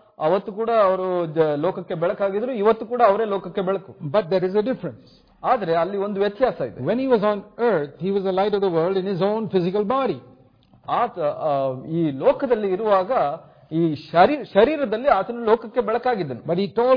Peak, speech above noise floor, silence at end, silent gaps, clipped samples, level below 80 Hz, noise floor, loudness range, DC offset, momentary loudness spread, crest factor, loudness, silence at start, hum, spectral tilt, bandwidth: -2 dBFS; 33 dB; 0 s; none; under 0.1%; -58 dBFS; -54 dBFS; 3 LU; under 0.1%; 7 LU; 20 dB; -22 LUFS; 0.2 s; none; -9.5 dB/octave; 5.2 kHz